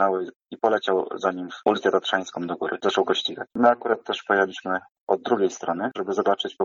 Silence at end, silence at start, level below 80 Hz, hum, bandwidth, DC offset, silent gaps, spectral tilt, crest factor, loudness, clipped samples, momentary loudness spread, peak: 0 s; 0 s; -72 dBFS; none; 7.6 kHz; under 0.1%; 0.36-0.40 s, 4.91-4.95 s, 5.01-5.07 s; -4 dB/octave; 18 dB; -24 LUFS; under 0.1%; 8 LU; -6 dBFS